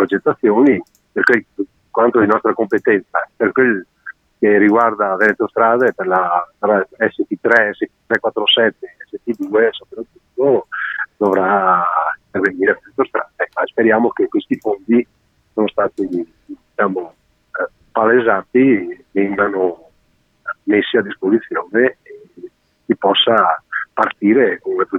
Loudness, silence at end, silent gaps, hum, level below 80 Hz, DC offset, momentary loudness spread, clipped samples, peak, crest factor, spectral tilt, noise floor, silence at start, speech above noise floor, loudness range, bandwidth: -16 LUFS; 0 s; none; none; -62 dBFS; under 0.1%; 13 LU; under 0.1%; 0 dBFS; 16 dB; -6.5 dB/octave; -59 dBFS; 0 s; 44 dB; 4 LU; 7.8 kHz